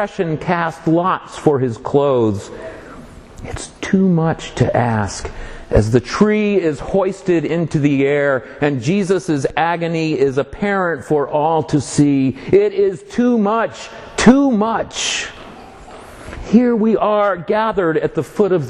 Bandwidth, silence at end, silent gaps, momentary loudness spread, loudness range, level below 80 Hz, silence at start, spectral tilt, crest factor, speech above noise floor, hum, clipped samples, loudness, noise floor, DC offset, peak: 11.5 kHz; 0 s; none; 15 LU; 3 LU; -38 dBFS; 0 s; -6 dB/octave; 16 dB; 21 dB; none; under 0.1%; -16 LUFS; -37 dBFS; under 0.1%; 0 dBFS